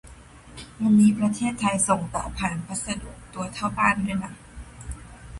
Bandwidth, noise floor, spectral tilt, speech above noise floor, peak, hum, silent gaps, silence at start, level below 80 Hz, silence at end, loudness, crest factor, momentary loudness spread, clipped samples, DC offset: 11.5 kHz; -46 dBFS; -4.5 dB/octave; 23 dB; -6 dBFS; none; none; 0.05 s; -44 dBFS; 0 s; -24 LUFS; 20 dB; 23 LU; under 0.1%; under 0.1%